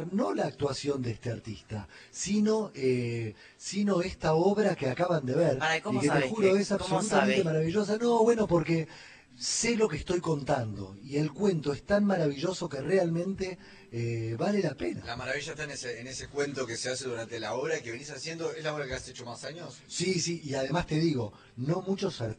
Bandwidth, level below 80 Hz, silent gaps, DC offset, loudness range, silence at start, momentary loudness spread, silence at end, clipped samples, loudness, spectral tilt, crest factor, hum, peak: 9.6 kHz; -56 dBFS; none; under 0.1%; 7 LU; 0 s; 13 LU; 0.05 s; under 0.1%; -30 LUFS; -5 dB/octave; 20 dB; none; -10 dBFS